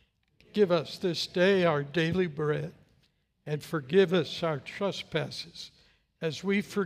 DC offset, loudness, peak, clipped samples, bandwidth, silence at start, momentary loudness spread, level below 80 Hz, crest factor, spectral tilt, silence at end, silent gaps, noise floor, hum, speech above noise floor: under 0.1%; -29 LUFS; -12 dBFS; under 0.1%; 15.5 kHz; 0.55 s; 14 LU; -66 dBFS; 18 dB; -6 dB/octave; 0 s; none; -70 dBFS; none; 41 dB